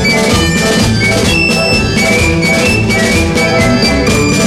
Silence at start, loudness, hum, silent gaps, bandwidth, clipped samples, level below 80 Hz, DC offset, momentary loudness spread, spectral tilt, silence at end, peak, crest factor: 0 s; -9 LUFS; none; none; 16 kHz; under 0.1%; -24 dBFS; under 0.1%; 1 LU; -4 dB/octave; 0 s; 0 dBFS; 10 dB